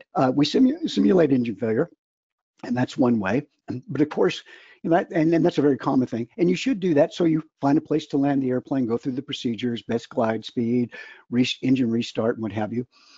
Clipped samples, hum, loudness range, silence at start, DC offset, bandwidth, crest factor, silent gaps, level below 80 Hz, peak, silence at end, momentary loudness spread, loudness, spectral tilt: under 0.1%; none; 3 LU; 0.15 s; under 0.1%; 7.8 kHz; 16 dB; 1.99-2.53 s; -62 dBFS; -6 dBFS; 0.35 s; 9 LU; -23 LUFS; -6.5 dB/octave